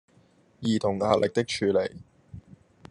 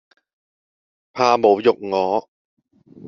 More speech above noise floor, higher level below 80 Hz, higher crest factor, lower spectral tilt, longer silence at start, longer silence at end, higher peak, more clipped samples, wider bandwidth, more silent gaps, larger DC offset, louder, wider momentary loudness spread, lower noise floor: second, 36 dB vs over 73 dB; about the same, -62 dBFS vs -66 dBFS; about the same, 20 dB vs 20 dB; first, -5.5 dB/octave vs -3.5 dB/octave; second, 0.6 s vs 1.15 s; first, 0.5 s vs 0 s; second, -8 dBFS vs -2 dBFS; neither; first, 11 kHz vs 7 kHz; second, none vs 2.28-2.57 s; neither; second, -26 LUFS vs -18 LUFS; first, 15 LU vs 10 LU; second, -61 dBFS vs under -90 dBFS